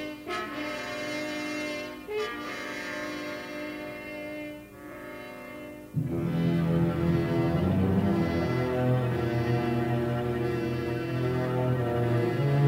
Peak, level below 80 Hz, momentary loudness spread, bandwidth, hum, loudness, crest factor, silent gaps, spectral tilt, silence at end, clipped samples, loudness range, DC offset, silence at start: -12 dBFS; -52 dBFS; 13 LU; 16 kHz; none; -29 LUFS; 16 dB; none; -7.5 dB/octave; 0 s; under 0.1%; 10 LU; under 0.1%; 0 s